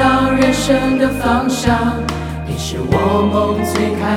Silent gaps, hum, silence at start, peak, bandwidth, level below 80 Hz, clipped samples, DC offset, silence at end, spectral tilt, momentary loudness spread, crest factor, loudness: none; none; 0 s; 0 dBFS; 16.5 kHz; -32 dBFS; under 0.1%; under 0.1%; 0 s; -5.5 dB/octave; 9 LU; 14 dB; -15 LUFS